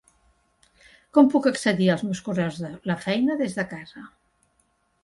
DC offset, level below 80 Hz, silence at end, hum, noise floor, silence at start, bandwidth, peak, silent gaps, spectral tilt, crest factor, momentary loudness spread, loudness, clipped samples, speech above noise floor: under 0.1%; -62 dBFS; 0.95 s; none; -68 dBFS; 1.15 s; 11.5 kHz; -4 dBFS; none; -6 dB/octave; 22 dB; 14 LU; -23 LUFS; under 0.1%; 45 dB